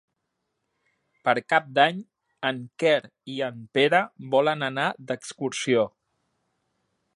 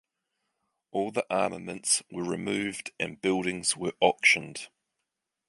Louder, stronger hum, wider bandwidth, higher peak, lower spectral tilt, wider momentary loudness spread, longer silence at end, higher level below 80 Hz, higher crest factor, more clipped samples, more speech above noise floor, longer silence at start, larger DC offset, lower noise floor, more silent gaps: about the same, -25 LUFS vs -27 LUFS; neither; about the same, 11.5 kHz vs 11.5 kHz; first, -4 dBFS vs -8 dBFS; first, -4 dB/octave vs -2.5 dB/octave; about the same, 10 LU vs 12 LU; first, 1.25 s vs 0.8 s; second, -76 dBFS vs -68 dBFS; about the same, 22 dB vs 22 dB; neither; about the same, 55 dB vs 56 dB; first, 1.25 s vs 0.95 s; neither; second, -79 dBFS vs -84 dBFS; neither